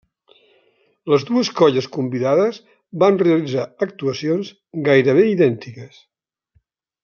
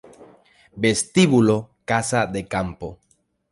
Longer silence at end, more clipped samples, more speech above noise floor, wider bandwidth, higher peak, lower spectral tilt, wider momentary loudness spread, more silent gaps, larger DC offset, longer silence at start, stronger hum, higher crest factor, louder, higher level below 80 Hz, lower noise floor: first, 1.15 s vs 0.6 s; neither; first, 46 dB vs 32 dB; second, 7 kHz vs 11.5 kHz; first, 0 dBFS vs -4 dBFS; first, -6.5 dB/octave vs -5 dB/octave; first, 16 LU vs 13 LU; neither; neither; first, 1.05 s vs 0.2 s; neither; about the same, 18 dB vs 18 dB; about the same, -18 LUFS vs -20 LUFS; second, -66 dBFS vs -50 dBFS; first, -64 dBFS vs -52 dBFS